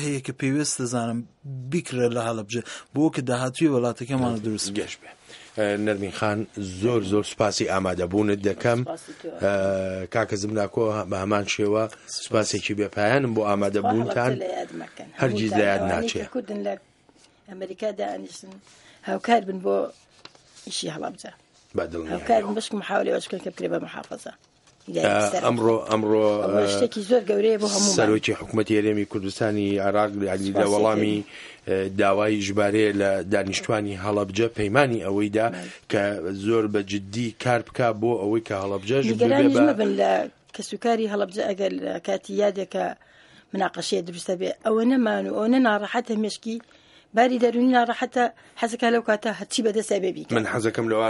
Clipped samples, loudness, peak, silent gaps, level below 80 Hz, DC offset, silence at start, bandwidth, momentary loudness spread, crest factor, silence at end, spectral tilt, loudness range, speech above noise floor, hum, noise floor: under 0.1%; -24 LUFS; 0 dBFS; none; -60 dBFS; under 0.1%; 0 s; 11.5 kHz; 11 LU; 24 dB; 0 s; -5 dB/octave; 6 LU; 34 dB; none; -57 dBFS